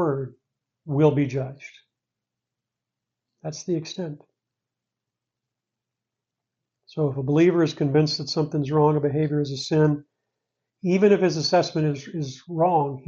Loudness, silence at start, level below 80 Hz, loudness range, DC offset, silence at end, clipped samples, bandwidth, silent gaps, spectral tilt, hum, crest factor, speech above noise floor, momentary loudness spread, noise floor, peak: -23 LUFS; 0 s; -66 dBFS; 14 LU; under 0.1%; 0.05 s; under 0.1%; 7.4 kHz; none; -6.5 dB/octave; none; 18 dB; 64 dB; 15 LU; -86 dBFS; -6 dBFS